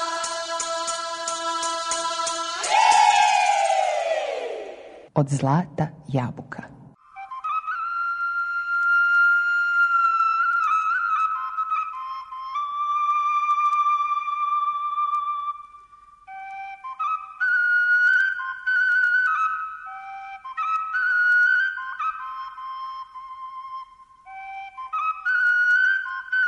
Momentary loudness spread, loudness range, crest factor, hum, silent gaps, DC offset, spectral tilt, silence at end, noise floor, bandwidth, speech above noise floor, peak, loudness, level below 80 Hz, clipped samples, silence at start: 19 LU; 7 LU; 18 dB; none; none; under 0.1%; -3 dB/octave; 0 s; -50 dBFS; 11 kHz; 25 dB; -6 dBFS; -22 LUFS; -66 dBFS; under 0.1%; 0 s